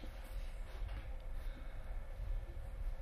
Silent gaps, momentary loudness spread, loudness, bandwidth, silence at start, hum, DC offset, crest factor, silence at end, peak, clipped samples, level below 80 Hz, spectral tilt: none; 3 LU; -50 LUFS; 13.5 kHz; 0 s; none; under 0.1%; 12 dB; 0 s; -32 dBFS; under 0.1%; -44 dBFS; -6 dB/octave